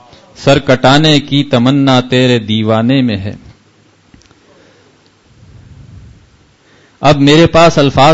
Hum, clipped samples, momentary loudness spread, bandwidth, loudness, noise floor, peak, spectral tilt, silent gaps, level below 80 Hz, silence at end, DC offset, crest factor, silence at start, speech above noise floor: none; 0.2%; 7 LU; 8 kHz; -9 LUFS; -48 dBFS; 0 dBFS; -6 dB/octave; none; -38 dBFS; 0 s; under 0.1%; 12 dB; 0.4 s; 40 dB